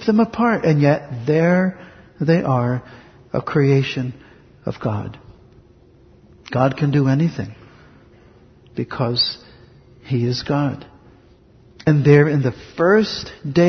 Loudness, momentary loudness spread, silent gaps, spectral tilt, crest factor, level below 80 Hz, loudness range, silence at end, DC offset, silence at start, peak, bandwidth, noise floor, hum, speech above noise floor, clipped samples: -19 LUFS; 14 LU; none; -7.5 dB/octave; 20 dB; -50 dBFS; 5 LU; 0 s; under 0.1%; 0 s; 0 dBFS; 6.4 kHz; -50 dBFS; none; 32 dB; under 0.1%